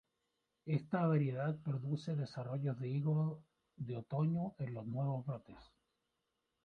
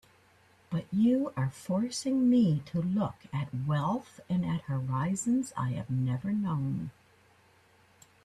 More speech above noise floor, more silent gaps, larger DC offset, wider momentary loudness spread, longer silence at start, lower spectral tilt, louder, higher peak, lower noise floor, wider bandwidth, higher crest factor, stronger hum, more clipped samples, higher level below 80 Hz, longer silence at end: first, 48 dB vs 33 dB; neither; neither; about the same, 11 LU vs 9 LU; about the same, 0.65 s vs 0.7 s; first, -9.5 dB/octave vs -7 dB/octave; second, -39 LUFS vs -31 LUFS; second, -22 dBFS vs -18 dBFS; first, -86 dBFS vs -63 dBFS; second, 6.6 kHz vs 12.5 kHz; about the same, 18 dB vs 14 dB; neither; neither; second, -74 dBFS vs -64 dBFS; second, 1 s vs 1.35 s